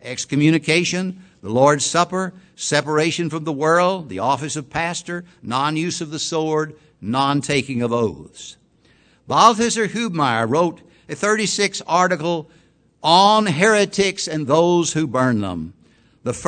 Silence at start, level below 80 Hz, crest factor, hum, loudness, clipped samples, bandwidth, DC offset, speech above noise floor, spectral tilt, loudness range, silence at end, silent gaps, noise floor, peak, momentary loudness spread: 0.05 s; -56 dBFS; 20 dB; none; -19 LUFS; under 0.1%; 11 kHz; under 0.1%; 37 dB; -4 dB/octave; 5 LU; 0 s; none; -56 dBFS; 0 dBFS; 13 LU